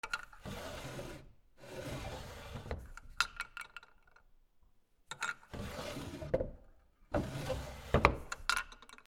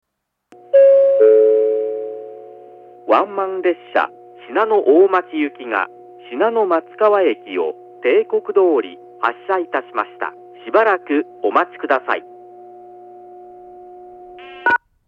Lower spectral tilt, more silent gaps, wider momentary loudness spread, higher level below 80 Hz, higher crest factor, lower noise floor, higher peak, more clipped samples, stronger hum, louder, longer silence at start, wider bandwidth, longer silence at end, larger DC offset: second, -4.5 dB/octave vs -6 dB/octave; neither; about the same, 16 LU vs 16 LU; first, -50 dBFS vs -72 dBFS; first, 36 dB vs 18 dB; first, -67 dBFS vs -55 dBFS; second, -6 dBFS vs 0 dBFS; neither; neither; second, -39 LUFS vs -17 LUFS; second, 0.05 s vs 0.75 s; first, 19.5 kHz vs 5.2 kHz; second, 0.05 s vs 0.3 s; neither